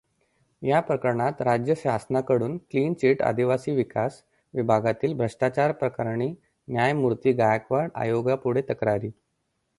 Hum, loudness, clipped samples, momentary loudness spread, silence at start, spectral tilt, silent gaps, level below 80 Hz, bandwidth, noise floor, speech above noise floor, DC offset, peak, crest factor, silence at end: none; -25 LUFS; under 0.1%; 7 LU; 0.6 s; -7.5 dB/octave; none; -60 dBFS; 11.5 kHz; -75 dBFS; 51 dB; under 0.1%; -6 dBFS; 18 dB; 0.65 s